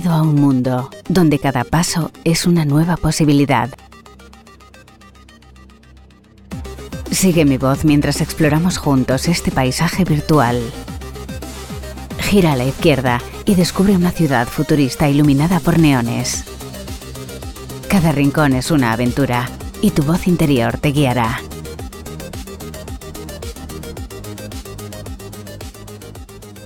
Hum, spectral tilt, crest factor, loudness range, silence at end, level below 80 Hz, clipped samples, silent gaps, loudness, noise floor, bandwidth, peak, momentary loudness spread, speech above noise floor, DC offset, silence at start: none; -5.5 dB/octave; 16 dB; 15 LU; 0 s; -34 dBFS; under 0.1%; none; -15 LUFS; -44 dBFS; 18 kHz; 0 dBFS; 17 LU; 30 dB; under 0.1%; 0 s